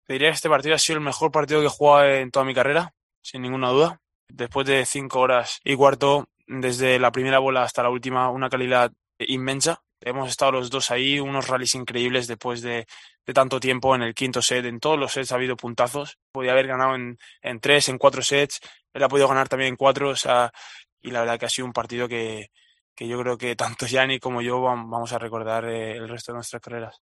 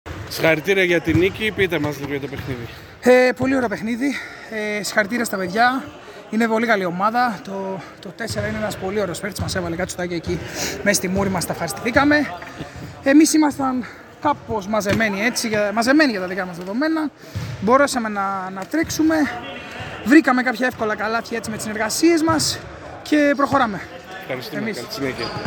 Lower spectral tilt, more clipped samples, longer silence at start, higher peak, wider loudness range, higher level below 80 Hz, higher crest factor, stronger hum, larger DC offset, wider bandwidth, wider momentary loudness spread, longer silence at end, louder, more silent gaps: about the same, -3.5 dB/octave vs -4.5 dB/octave; neither; about the same, 0.1 s vs 0.05 s; about the same, -2 dBFS vs -2 dBFS; about the same, 5 LU vs 4 LU; second, -62 dBFS vs -50 dBFS; about the same, 22 dB vs 20 dB; neither; neither; second, 12.5 kHz vs 19.5 kHz; about the same, 14 LU vs 14 LU; first, 0.15 s vs 0 s; about the same, -22 LUFS vs -20 LUFS; first, 3.03-3.09 s, 3.17-3.22 s, 4.15-4.27 s, 16.22-16.34 s, 20.92-20.97 s, 22.81-22.96 s vs none